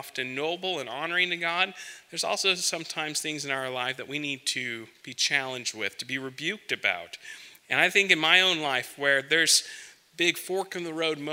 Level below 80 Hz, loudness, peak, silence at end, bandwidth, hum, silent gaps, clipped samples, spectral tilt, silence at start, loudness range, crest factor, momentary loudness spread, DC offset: -80 dBFS; -26 LUFS; -4 dBFS; 0 s; 16 kHz; none; none; under 0.1%; -1 dB/octave; 0 s; 7 LU; 24 dB; 14 LU; under 0.1%